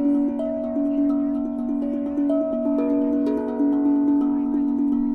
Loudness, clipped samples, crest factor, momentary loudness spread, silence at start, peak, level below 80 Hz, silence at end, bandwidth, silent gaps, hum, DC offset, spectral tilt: -22 LUFS; under 0.1%; 10 dB; 5 LU; 0 s; -12 dBFS; -52 dBFS; 0 s; 3.2 kHz; none; none; under 0.1%; -9.5 dB/octave